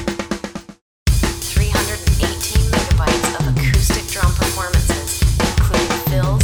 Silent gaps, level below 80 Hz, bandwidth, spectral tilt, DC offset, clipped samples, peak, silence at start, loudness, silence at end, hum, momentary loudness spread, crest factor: 0.81-1.06 s; -20 dBFS; over 20 kHz; -4.5 dB/octave; under 0.1%; under 0.1%; -2 dBFS; 0 s; -18 LUFS; 0 s; none; 7 LU; 14 dB